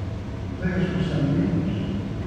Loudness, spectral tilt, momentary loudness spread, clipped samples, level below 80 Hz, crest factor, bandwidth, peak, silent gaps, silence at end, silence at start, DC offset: -25 LUFS; -8 dB/octave; 9 LU; under 0.1%; -38 dBFS; 14 dB; 8.8 kHz; -10 dBFS; none; 0 s; 0 s; under 0.1%